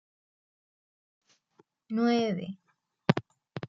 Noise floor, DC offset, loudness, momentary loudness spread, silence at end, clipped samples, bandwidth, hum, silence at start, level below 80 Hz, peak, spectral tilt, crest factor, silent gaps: -67 dBFS; under 0.1%; -30 LUFS; 18 LU; 0 s; under 0.1%; 7.2 kHz; none; 1.9 s; -76 dBFS; -4 dBFS; -7 dB/octave; 28 dB; none